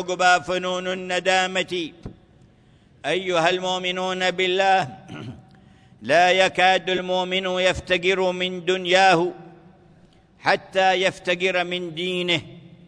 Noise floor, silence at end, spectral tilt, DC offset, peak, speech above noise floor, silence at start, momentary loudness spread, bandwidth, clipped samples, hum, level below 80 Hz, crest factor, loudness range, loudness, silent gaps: -54 dBFS; 0.1 s; -3.5 dB/octave; under 0.1%; -4 dBFS; 33 dB; 0 s; 10 LU; 10.5 kHz; under 0.1%; none; -56 dBFS; 18 dB; 4 LU; -21 LUFS; none